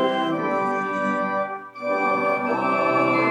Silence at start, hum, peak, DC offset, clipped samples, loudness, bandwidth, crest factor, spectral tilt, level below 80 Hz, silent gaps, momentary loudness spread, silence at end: 0 s; none; -10 dBFS; under 0.1%; under 0.1%; -23 LUFS; 11.5 kHz; 14 dB; -6 dB/octave; -78 dBFS; none; 7 LU; 0 s